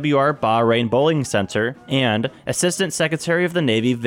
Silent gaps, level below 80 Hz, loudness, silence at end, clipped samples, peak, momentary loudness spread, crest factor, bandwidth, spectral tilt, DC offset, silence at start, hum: none; -58 dBFS; -19 LUFS; 0 s; under 0.1%; -6 dBFS; 5 LU; 12 dB; 18 kHz; -4.5 dB/octave; under 0.1%; 0 s; none